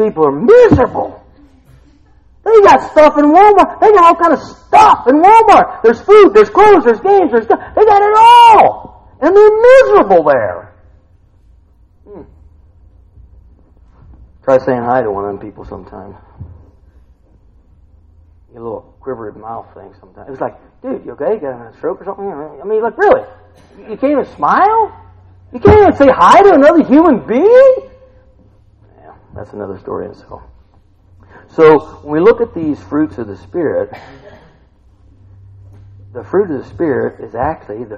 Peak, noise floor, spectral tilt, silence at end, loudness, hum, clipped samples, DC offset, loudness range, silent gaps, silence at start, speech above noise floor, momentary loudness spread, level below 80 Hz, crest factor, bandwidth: 0 dBFS; -47 dBFS; -6.5 dB/octave; 0 s; -9 LUFS; none; 0.8%; under 0.1%; 20 LU; none; 0 s; 38 dB; 21 LU; -38 dBFS; 12 dB; 11.5 kHz